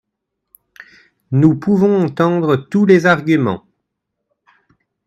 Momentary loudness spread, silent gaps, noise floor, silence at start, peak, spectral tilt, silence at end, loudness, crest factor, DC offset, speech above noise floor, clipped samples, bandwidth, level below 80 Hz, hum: 7 LU; none; -76 dBFS; 1.3 s; 0 dBFS; -8 dB/octave; 1.5 s; -14 LUFS; 16 dB; under 0.1%; 63 dB; under 0.1%; 13 kHz; -56 dBFS; none